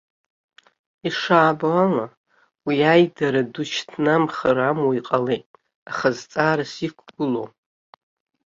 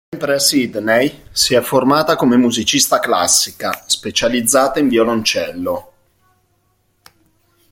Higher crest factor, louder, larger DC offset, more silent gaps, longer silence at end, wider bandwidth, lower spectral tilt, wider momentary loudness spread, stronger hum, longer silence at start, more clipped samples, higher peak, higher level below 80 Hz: about the same, 20 dB vs 16 dB; second, -21 LUFS vs -14 LUFS; neither; first, 2.17-2.24 s, 5.46-5.54 s, 5.75-5.86 s vs none; second, 1 s vs 1.9 s; second, 7.6 kHz vs 17 kHz; first, -6 dB/octave vs -2.5 dB/octave; first, 13 LU vs 7 LU; neither; first, 1.05 s vs 0.1 s; neither; about the same, -2 dBFS vs 0 dBFS; second, -64 dBFS vs -50 dBFS